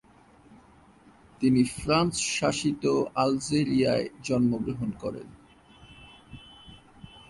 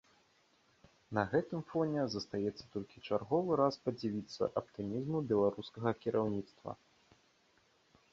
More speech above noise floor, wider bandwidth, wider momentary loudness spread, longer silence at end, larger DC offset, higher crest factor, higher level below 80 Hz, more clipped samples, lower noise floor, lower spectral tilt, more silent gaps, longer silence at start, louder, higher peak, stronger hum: second, 30 dB vs 36 dB; first, 11.5 kHz vs 7.6 kHz; first, 21 LU vs 12 LU; second, 0.1 s vs 1.4 s; neither; about the same, 18 dB vs 22 dB; first, -54 dBFS vs -68 dBFS; neither; second, -56 dBFS vs -71 dBFS; about the same, -5 dB/octave vs -6 dB/octave; neither; second, 0.5 s vs 1.1 s; first, -26 LUFS vs -36 LUFS; first, -10 dBFS vs -14 dBFS; neither